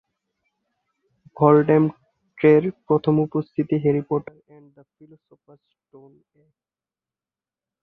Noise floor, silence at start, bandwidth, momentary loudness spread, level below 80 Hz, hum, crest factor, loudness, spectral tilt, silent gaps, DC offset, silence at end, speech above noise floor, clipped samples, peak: under -90 dBFS; 1.4 s; 4.5 kHz; 9 LU; -64 dBFS; none; 20 dB; -20 LUFS; -11 dB/octave; none; under 0.1%; 3.6 s; over 69 dB; under 0.1%; -2 dBFS